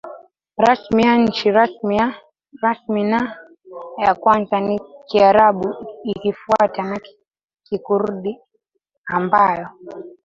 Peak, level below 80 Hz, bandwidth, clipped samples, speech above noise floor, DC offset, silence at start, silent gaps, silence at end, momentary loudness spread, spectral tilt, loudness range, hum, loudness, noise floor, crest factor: 0 dBFS; -54 dBFS; 7.6 kHz; under 0.1%; 55 dB; under 0.1%; 0.05 s; 8.97-9.04 s; 0.15 s; 19 LU; -6.5 dB/octave; 5 LU; none; -18 LUFS; -72 dBFS; 18 dB